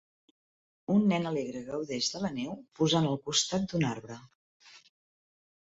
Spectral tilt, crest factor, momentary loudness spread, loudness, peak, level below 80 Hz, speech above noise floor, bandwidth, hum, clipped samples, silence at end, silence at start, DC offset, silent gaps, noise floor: -4.5 dB/octave; 20 dB; 14 LU; -30 LUFS; -14 dBFS; -66 dBFS; over 60 dB; 8 kHz; none; under 0.1%; 0.95 s; 0.9 s; under 0.1%; 4.35-4.60 s; under -90 dBFS